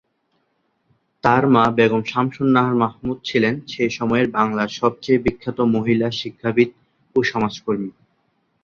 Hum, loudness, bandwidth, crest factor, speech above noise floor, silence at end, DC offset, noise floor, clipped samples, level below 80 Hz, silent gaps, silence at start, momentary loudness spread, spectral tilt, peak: none; -19 LUFS; 7.2 kHz; 18 dB; 49 dB; 0.75 s; under 0.1%; -68 dBFS; under 0.1%; -50 dBFS; none; 1.25 s; 8 LU; -6.5 dB/octave; -2 dBFS